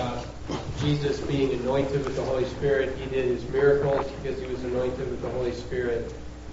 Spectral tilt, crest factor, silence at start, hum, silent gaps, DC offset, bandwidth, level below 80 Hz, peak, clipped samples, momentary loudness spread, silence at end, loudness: -5.5 dB/octave; 16 dB; 0 s; none; none; under 0.1%; 8 kHz; -42 dBFS; -10 dBFS; under 0.1%; 9 LU; 0 s; -27 LUFS